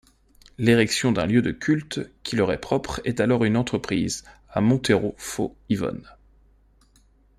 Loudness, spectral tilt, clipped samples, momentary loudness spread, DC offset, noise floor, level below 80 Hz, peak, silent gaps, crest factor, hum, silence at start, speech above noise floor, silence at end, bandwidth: -23 LUFS; -5.5 dB/octave; under 0.1%; 11 LU; under 0.1%; -58 dBFS; -50 dBFS; -6 dBFS; none; 20 dB; none; 0.6 s; 35 dB; 1.3 s; 15 kHz